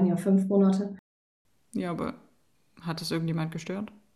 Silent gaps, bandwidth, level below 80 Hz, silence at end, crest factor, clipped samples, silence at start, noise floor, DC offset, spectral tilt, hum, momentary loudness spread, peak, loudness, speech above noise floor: 0.99-1.45 s; 12.5 kHz; -66 dBFS; 0.25 s; 16 dB; under 0.1%; 0 s; -70 dBFS; under 0.1%; -7.5 dB/octave; none; 14 LU; -12 dBFS; -29 LUFS; 42 dB